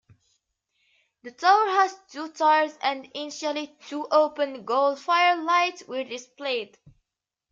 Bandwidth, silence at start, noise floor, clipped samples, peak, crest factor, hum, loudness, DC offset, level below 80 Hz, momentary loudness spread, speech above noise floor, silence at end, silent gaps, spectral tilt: 7.6 kHz; 1.25 s; -86 dBFS; under 0.1%; -6 dBFS; 20 dB; none; -24 LUFS; under 0.1%; -76 dBFS; 14 LU; 62 dB; 0.85 s; none; -2 dB/octave